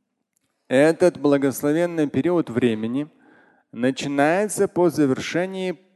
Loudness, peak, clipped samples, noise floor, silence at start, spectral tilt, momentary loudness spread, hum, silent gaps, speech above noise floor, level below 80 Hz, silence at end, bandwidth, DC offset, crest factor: -21 LUFS; -4 dBFS; under 0.1%; -73 dBFS; 0.7 s; -5.5 dB/octave; 9 LU; none; none; 52 dB; -62 dBFS; 0.2 s; 12.5 kHz; under 0.1%; 16 dB